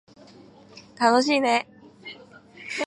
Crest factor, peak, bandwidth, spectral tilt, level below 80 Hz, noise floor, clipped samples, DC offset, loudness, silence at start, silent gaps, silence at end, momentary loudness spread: 22 dB; -4 dBFS; 11.5 kHz; -3 dB/octave; -74 dBFS; -50 dBFS; under 0.1%; under 0.1%; -22 LUFS; 0.75 s; none; 0 s; 23 LU